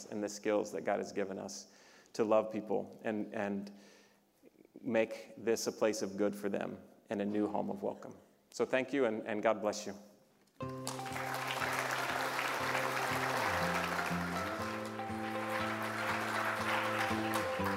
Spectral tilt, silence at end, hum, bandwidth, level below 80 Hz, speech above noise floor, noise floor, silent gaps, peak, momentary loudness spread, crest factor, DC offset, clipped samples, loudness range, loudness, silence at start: -4 dB/octave; 0 s; none; 16 kHz; -72 dBFS; 31 dB; -66 dBFS; none; -16 dBFS; 10 LU; 22 dB; under 0.1%; under 0.1%; 3 LU; -36 LUFS; 0 s